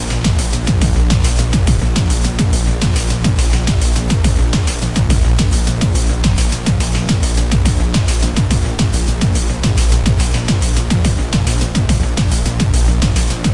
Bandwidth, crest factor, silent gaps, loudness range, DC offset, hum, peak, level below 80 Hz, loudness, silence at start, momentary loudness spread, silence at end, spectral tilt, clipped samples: 11.5 kHz; 12 dB; none; 0 LU; 0.6%; none; 0 dBFS; -16 dBFS; -15 LUFS; 0 s; 2 LU; 0 s; -5 dB/octave; under 0.1%